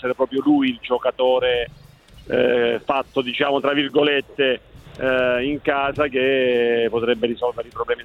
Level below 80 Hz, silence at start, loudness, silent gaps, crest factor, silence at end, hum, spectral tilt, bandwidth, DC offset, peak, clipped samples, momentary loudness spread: -50 dBFS; 0.05 s; -20 LUFS; none; 14 dB; 0 s; none; -6.5 dB/octave; 6.2 kHz; under 0.1%; -6 dBFS; under 0.1%; 7 LU